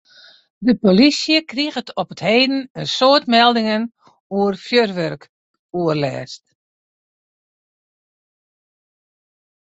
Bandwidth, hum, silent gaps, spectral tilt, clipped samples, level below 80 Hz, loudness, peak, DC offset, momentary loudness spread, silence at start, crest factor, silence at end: 8.2 kHz; none; 2.70-2.75 s, 4.20-4.30 s, 5.29-5.69 s; -5 dB/octave; under 0.1%; -60 dBFS; -17 LUFS; -2 dBFS; under 0.1%; 15 LU; 0.6 s; 18 dB; 3.4 s